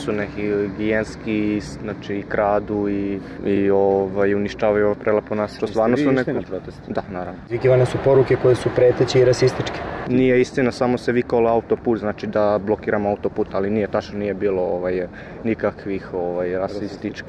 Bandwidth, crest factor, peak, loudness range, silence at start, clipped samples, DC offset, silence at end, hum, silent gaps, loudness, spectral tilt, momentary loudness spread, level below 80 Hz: 10.5 kHz; 14 dB; -6 dBFS; 5 LU; 0 s; under 0.1%; under 0.1%; 0 s; none; none; -20 LUFS; -7 dB/octave; 11 LU; -46 dBFS